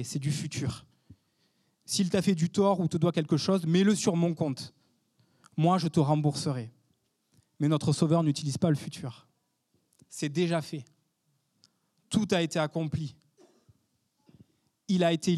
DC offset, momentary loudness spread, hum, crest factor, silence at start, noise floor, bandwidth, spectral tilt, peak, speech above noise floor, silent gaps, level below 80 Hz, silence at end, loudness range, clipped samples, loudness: under 0.1%; 14 LU; none; 18 dB; 0 s; -75 dBFS; 13 kHz; -6 dB/octave; -10 dBFS; 48 dB; none; -68 dBFS; 0 s; 7 LU; under 0.1%; -28 LUFS